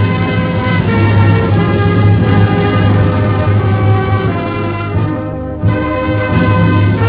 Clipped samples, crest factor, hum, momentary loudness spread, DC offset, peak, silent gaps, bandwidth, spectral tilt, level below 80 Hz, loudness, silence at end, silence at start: under 0.1%; 10 dB; none; 6 LU; under 0.1%; 0 dBFS; none; 4.8 kHz; -11 dB/octave; -28 dBFS; -12 LUFS; 0 s; 0 s